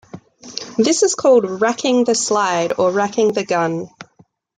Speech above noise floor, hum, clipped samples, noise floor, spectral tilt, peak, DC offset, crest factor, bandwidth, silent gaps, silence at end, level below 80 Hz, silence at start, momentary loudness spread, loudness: 38 dB; none; under 0.1%; -54 dBFS; -3.5 dB/octave; -2 dBFS; under 0.1%; 16 dB; 9.6 kHz; none; 0.55 s; -64 dBFS; 0.15 s; 12 LU; -17 LUFS